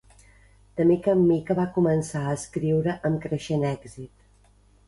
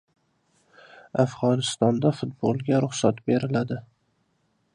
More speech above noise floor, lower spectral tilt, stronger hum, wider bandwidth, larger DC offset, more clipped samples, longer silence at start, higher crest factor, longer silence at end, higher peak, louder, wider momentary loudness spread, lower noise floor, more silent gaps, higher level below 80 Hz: second, 34 dB vs 46 dB; first, -7.5 dB/octave vs -6 dB/octave; first, 50 Hz at -50 dBFS vs none; about the same, 11.5 kHz vs 11 kHz; neither; neither; second, 0.75 s vs 1.15 s; about the same, 16 dB vs 20 dB; second, 0.8 s vs 0.95 s; second, -8 dBFS vs -4 dBFS; about the same, -24 LUFS vs -25 LUFS; first, 16 LU vs 6 LU; second, -58 dBFS vs -70 dBFS; neither; first, -54 dBFS vs -64 dBFS